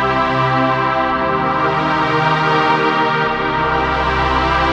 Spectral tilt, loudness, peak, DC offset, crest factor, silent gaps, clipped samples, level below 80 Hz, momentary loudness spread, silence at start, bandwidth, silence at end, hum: -6 dB/octave; -15 LUFS; -2 dBFS; under 0.1%; 14 dB; none; under 0.1%; -32 dBFS; 2 LU; 0 s; 9.2 kHz; 0 s; none